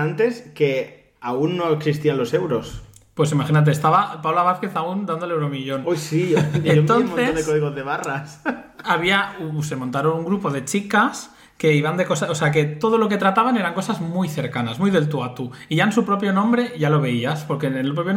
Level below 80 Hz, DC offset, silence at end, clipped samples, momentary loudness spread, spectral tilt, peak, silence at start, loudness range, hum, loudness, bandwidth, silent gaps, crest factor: -54 dBFS; under 0.1%; 0 s; under 0.1%; 9 LU; -6 dB/octave; -6 dBFS; 0 s; 2 LU; none; -20 LUFS; 15.5 kHz; none; 14 dB